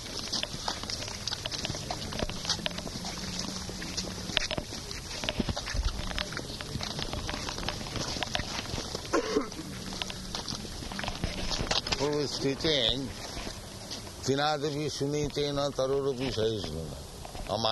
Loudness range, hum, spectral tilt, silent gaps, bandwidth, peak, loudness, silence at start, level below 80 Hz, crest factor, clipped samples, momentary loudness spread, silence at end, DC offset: 3 LU; none; -3.5 dB/octave; none; 12 kHz; -4 dBFS; -32 LUFS; 0 s; -44 dBFS; 28 dB; under 0.1%; 9 LU; 0 s; under 0.1%